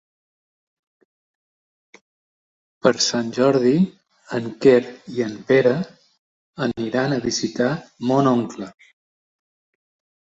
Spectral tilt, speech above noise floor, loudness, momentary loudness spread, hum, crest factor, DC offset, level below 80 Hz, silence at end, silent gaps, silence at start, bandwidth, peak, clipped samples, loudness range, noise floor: -5 dB/octave; over 71 dB; -20 LUFS; 12 LU; none; 20 dB; under 0.1%; -60 dBFS; 1.55 s; 6.18-6.53 s; 2.85 s; 8 kHz; -2 dBFS; under 0.1%; 5 LU; under -90 dBFS